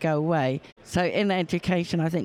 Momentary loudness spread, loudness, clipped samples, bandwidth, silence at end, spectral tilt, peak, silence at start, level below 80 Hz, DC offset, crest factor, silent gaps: 5 LU; -26 LUFS; under 0.1%; 13.5 kHz; 0 s; -6.5 dB/octave; -10 dBFS; 0 s; -54 dBFS; under 0.1%; 14 dB; 0.72-0.76 s